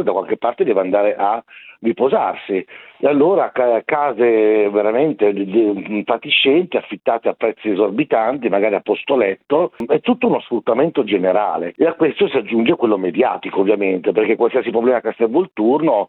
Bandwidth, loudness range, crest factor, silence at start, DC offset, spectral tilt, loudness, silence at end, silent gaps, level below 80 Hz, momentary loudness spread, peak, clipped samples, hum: 4.2 kHz; 2 LU; 14 dB; 0 s; under 0.1%; -9 dB/octave; -17 LUFS; 0.05 s; none; -64 dBFS; 6 LU; -2 dBFS; under 0.1%; none